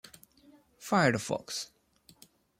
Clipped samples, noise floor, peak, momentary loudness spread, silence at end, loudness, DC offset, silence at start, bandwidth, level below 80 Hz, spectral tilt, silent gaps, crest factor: under 0.1%; -61 dBFS; -12 dBFS; 21 LU; 0.95 s; -30 LUFS; under 0.1%; 0.8 s; 16.5 kHz; -70 dBFS; -4.5 dB/octave; none; 22 dB